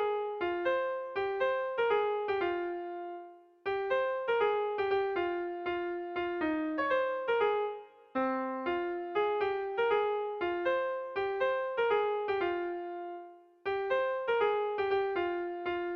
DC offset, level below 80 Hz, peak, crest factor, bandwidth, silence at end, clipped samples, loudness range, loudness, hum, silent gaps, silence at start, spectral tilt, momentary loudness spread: under 0.1%; -68 dBFS; -18 dBFS; 14 dB; 6 kHz; 0 s; under 0.1%; 1 LU; -32 LUFS; none; none; 0 s; -6 dB/octave; 8 LU